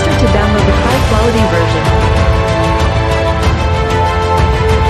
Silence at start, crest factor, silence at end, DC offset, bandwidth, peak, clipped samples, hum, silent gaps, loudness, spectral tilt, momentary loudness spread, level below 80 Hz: 0 s; 10 dB; 0 s; under 0.1%; 13.5 kHz; 0 dBFS; under 0.1%; none; none; -12 LUFS; -6 dB/octave; 2 LU; -16 dBFS